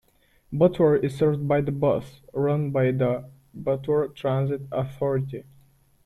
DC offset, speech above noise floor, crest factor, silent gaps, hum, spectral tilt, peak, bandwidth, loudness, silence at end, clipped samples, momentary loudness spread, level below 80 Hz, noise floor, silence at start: under 0.1%; 37 dB; 18 dB; none; none; -9 dB/octave; -6 dBFS; 12.5 kHz; -25 LUFS; 0.65 s; under 0.1%; 12 LU; -54 dBFS; -61 dBFS; 0.5 s